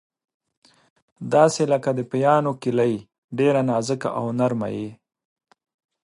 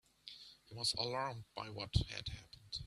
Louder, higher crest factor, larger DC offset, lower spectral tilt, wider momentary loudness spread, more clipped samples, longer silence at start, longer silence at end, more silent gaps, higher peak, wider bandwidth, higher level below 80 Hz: first, -22 LUFS vs -41 LUFS; about the same, 22 dB vs 24 dB; neither; first, -6 dB/octave vs -4 dB/octave; second, 14 LU vs 17 LU; neither; first, 1.2 s vs 0.25 s; first, 1.1 s vs 0 s; first, 3.18-3.29 s vs none; first, -2 dBFS vs -18 dBFS; about the same, 11.5 kHz vs 12.5 kHz; second, -66 dBFS vs -52 dBFS